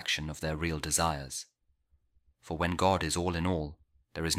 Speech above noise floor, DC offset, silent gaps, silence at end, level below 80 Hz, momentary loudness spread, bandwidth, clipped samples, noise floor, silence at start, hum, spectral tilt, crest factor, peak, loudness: 40 dB; under 0.1%; none; 0 s; -48 dBFS; 14 LU; 16 kHz; under 0.1%; -71 dBFS; 0 s; none; -3.5 dB/octave; 22 dB; -12 dBFS; -31 LUFS